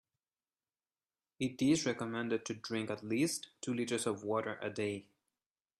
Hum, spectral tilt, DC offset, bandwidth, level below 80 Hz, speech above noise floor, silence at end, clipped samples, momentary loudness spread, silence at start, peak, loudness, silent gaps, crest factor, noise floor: none; -4.5 dB/octave; under 0.1%; 13.5 kHz; -76 dBFS; over 54 dB; 0.8 s; under 0.1%; 9 LU; 1.4 s; -20 dBFS; -37 LUFS; none; 18 dB; under -90 dBFS